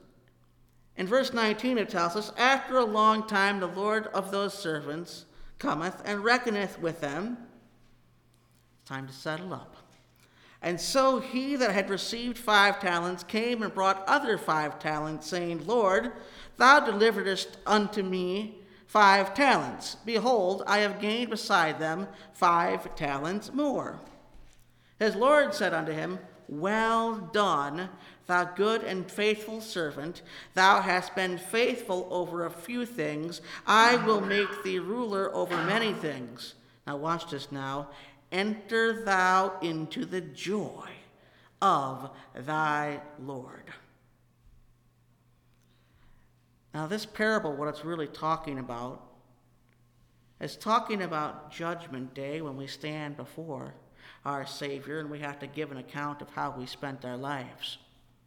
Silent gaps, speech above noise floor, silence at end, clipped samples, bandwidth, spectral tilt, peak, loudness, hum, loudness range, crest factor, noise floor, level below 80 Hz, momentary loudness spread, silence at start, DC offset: none; 36 dB; 0.5 s; under 0.1%; 19 kHz; -4 dB/octave; -4 dBFS; -28 LUFS; none; 12 LU; 26 dB; -65 dBFS; -62 dBFS; 17 LU; 0.95 s; under 0.1%